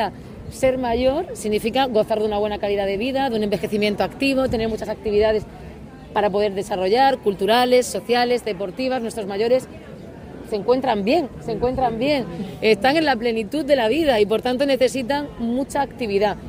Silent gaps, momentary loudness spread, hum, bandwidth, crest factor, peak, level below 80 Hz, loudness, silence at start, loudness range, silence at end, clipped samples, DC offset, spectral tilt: none; 9 LU; none; 16 kHz; 16 dB; -4 dBFS; -44 dBFS; -21 LUFS; 0 s; 3 LU; 0 s; under 0.1%; under 0.1%; -5 dB/octave